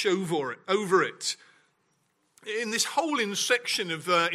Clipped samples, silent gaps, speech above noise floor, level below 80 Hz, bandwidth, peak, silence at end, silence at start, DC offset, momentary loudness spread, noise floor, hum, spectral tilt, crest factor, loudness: under 0.1%; none; 45 dB; -82 dBFS; 15.5 kHz; -8 dBFS; 0 s; 0 s; under 0.1%; 8 LU; -72 dBFS; none; -2.5 dB/octave; 20 dB; -27 LUFS